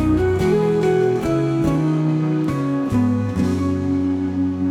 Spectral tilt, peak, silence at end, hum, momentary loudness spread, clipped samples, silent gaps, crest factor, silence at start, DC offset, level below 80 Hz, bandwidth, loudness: -8.5 dB/octave; -6 dBFS; 0 s; none; 4 LU; under 0.1%; none; 12 dB; 0 s; under 0.1%; -40 dBFS; 14 kHz; -19 LUFS